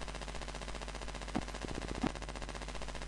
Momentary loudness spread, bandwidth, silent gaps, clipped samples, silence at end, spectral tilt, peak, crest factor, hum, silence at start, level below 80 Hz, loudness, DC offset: 5 LU; 11.5 kHz; none; under 0.1%; 0 s; -4.5 dB/octave; -16 dBFS; 26 dB; none; 0 s; -46 dBFS; -42 LUFS; under 0.1%